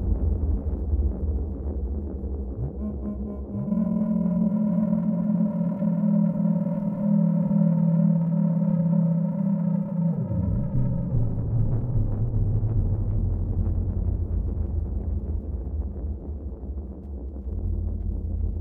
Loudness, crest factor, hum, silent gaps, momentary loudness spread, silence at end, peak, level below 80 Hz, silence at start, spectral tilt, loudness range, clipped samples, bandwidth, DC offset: -26 LUFS; 12 dB; none; none; 10 LU; 0 s; -12 dBFS; -30 dBFS; 0 s; -13.5 dB/octave; 8 LU; under 0.1%; 2.2 kHz; under 0.1%